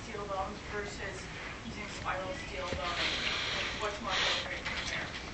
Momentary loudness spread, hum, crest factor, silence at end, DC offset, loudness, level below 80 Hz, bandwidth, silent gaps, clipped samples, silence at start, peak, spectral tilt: 10 LU; none; 20 dB; 0 s; under 0.1%; -35 LUFS; -50 dBFS; 8.8 kHz; none; under 0.1%; 0 s; -18 dBFS; -3 dB/octave